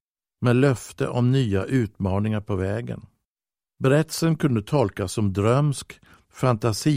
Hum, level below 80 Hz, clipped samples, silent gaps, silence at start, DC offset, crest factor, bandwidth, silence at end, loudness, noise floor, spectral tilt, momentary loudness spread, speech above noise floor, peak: none; -54 dBFS; under 0.1%; 3.25-3.36 s; 0.4 s; under 0.1%; 18 dB; 16 kHz; 0 s; -23 LUFS; under -90 dBFS; -6.5 dB/octave; 7 LU; over 68 dB; -6 dBFS